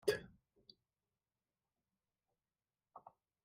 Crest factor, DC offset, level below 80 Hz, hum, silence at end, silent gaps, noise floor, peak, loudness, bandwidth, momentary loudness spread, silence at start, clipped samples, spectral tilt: 28 dB; under 0.1%; -78 dBFS; none; 0.45 s; none; under -90 dBFS; -22 dBFS; -42 LUFS; 6.6 kHz; 23 LU; 0.05 s; under 0.1%; -2.5 dB/octave